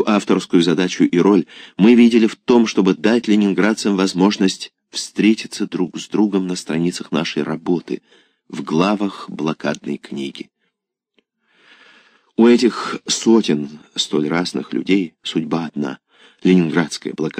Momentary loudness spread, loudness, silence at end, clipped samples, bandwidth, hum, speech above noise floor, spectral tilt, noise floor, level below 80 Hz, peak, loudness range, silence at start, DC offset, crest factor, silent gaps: 13 LU; -17 LUFS; 0 s; under 0.1%; 10 kHz; none; 59 dB; -5.5 dB/octave; -76 dBFS; -64 dBFS; -2 dBFS; 9 LU; 0 s; under 0.1%; 16 dB; none